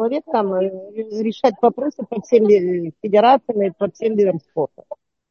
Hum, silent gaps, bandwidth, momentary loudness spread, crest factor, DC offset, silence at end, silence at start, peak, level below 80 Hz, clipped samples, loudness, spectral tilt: none; none; 6.8 kHz; 14 LU; 16 dB; under 0.1%; 0.35 s; 0 s; -2 dBFS; -68 dBFS; under 0.1%; -18 LUFS; -7 dB/octave